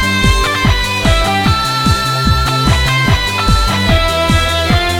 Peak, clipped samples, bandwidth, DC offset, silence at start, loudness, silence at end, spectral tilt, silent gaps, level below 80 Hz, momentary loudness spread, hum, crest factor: -2 dBFS; under 0.1%; 18 kHz; under 0.1%; 0 s; -12 LUFS; 0 s; -4.5 dB/octave; none; -18 dBFS; 1 LU; none; 10 dB